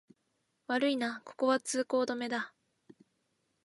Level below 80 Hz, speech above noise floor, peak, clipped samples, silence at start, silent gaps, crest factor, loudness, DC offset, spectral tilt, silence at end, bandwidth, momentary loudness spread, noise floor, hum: -86 dBFS; 47 dB; -16 dBFS; under 0.1%; 0.7 s; none; 18 dB; -33 LUFS; under 0.1%; -2.5 dB/octave; 1.2 s; 11.5 kHz; 8 LU; -79 dBFS; none